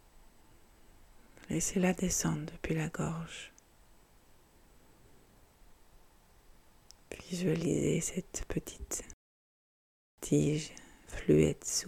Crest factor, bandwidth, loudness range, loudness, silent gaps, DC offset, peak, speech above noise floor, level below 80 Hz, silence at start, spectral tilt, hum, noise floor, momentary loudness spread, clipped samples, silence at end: 22 dB; 16 kHz; 10 LU; -33 LUFS; 9.13-10.18 s; under 0.1%; -14 dBFS; 29 dB; -54 dBFS; 0.15 s; -5 dB/octave; none; -62 dBFS; 17 LU; under 0.1%; 0 s